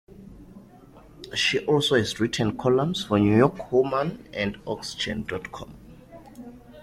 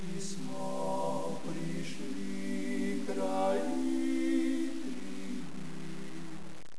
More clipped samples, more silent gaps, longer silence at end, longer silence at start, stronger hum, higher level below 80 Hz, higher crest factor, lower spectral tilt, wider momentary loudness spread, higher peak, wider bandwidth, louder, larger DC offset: neither; neither; about the same, 0 s vs 0 s; about the same, 0.1 s vs 0 s; neither; first, -52 dBFS vs -68 dBFS; about the same, 20 dB vs 16 dB; about the same, -5 dB/octave vs -5.5 dB/octave; first, 23 LU vs 13 LU; first, -6 dBFS vs -20 dBFS; first, 14.5 kHz vs 11 kHz; first, -24 LUFS vs -36 LUFS; second, under 0.1% vs 2%